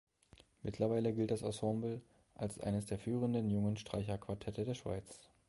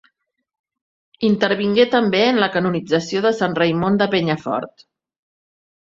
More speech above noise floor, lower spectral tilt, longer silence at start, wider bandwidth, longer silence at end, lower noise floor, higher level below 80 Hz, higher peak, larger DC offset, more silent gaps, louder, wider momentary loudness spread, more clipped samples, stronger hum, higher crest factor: second, 28 dB vs 51 dB; about the same, -7 dB/octave vs -6 dB/octave; second, 0.65 s vs 1.2 s; first, 11.5 kHz vs 7.6 kHz; second, 0.3 s vs 1.25 s; about the same, -66 dBFS vs -68 dBFS; about the same, -62 dBFS vs -58 dBFS; second, -22 dBFS vs -2 dBFS; neither; neither; second, -39 LUFS vs -18 LUFS; first, 10 LU vs 7 LU; neither; neither; about the same, 18 dB vs 18 dB